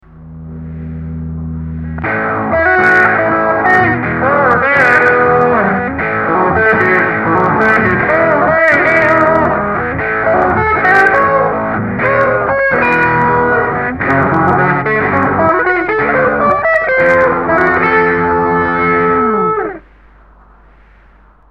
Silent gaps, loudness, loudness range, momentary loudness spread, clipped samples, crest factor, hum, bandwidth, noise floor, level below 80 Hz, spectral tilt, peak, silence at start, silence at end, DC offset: none; -11 LUFS; 3 LU; 8 LU; under 0.1%; 12 dB; none; 9.8 kHz; -44 dBFS; -36 dBFS; -8 dB/octave; 0 dBFS; 0.15 s; 1.7 s; under 0.1%